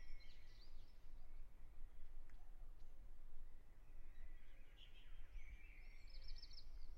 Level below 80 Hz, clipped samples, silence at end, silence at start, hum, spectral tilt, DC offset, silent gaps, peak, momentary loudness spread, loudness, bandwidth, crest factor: -54 dBFS; under 0.1%; 0 s; 0 s; none; -4.5 dB/octave; under 0.1%; none; -38 dBFS; 6 LU; -65 LUFS; 5.8 kHz; 12 dB